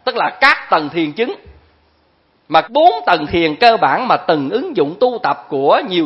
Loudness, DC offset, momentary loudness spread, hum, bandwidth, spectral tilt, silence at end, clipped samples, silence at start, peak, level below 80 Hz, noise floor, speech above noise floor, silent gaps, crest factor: -14 LUFS; under 0.1%; 8 LU; none; 10.5 kHz; -6 dB/octave; 0 s; under 0.1%; 0.05 s; 0 dBFS; -50 dBFS; -57 dBFS; 43 dB; none; 14 dB